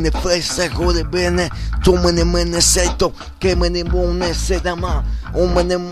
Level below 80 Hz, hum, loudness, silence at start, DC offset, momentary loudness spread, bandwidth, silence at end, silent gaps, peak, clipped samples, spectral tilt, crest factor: -22 dBFS; none; -17 LUFS; 0 s; under 0.1%; 8 LU; 13.5 kHz; 0 s; none; 0 dBFS; under 0.1%; -4 dB/octave; 16 dB